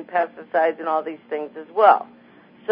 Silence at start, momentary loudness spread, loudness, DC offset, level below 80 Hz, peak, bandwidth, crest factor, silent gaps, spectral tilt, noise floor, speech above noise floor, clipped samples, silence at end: 0 s; 14 LU; -21 LUFS; under 0.1%; -78 dBFS; -2 dBFS; 5.2 kHz; 20 dB; none; -8.5 dB/octave; -49 dBFS; 29 dB; under 0.1%; 0 s